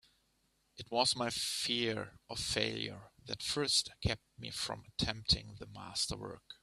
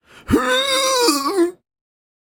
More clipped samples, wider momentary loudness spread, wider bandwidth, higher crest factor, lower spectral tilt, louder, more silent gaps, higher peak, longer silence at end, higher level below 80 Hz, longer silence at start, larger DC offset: neither; first, 14 LU vs 5 LU; second, 15 kHz vs 17.5 kHz; about the same, 24 dB vs 20 dB; about the same, -2.5 dB/octave vs -2.5 dB/octave; second, -35 LUFS vs -17 LUFS; neither; second, -14 dBFS vs 0 dBFS; second, 0.1 s vs 0.75 s; second, -56 dBFS vs -44 dBFS; first, 0.75 s vs 0.25 s; neither